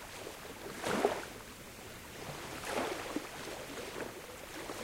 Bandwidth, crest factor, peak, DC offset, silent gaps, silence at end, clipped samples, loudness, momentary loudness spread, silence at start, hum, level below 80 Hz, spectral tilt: 16 kHz; 28 dB; -14 dBFS; under 0.1%; none; 0 s; under 0.1%; -41 LUFS; 14 LU; 0 s; none; -62 dBFS; -3.5 dB/octave